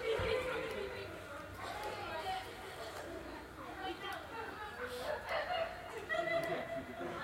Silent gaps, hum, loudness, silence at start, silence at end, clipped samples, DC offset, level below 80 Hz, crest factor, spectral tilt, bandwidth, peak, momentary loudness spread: none; none; -41 LUFS; 0 s; 0 s; under 0.1%; under 0.1%; -60 dBFS; 18 dB; -4 dB/octave; 16 kHz; -24 dBFS; 10 LU